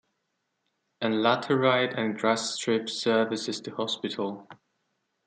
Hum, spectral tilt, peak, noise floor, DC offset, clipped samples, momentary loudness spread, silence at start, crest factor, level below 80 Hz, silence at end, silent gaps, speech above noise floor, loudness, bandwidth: none; -4 dB/octave; -8 dBFS; -79 dBFS; under 0.1%; under 0.1%; 9 LU; 1 s; 20 dB; -78 dBFS; 0.7 s; none; 52 dB; -27 LUFS; 9.6 kHz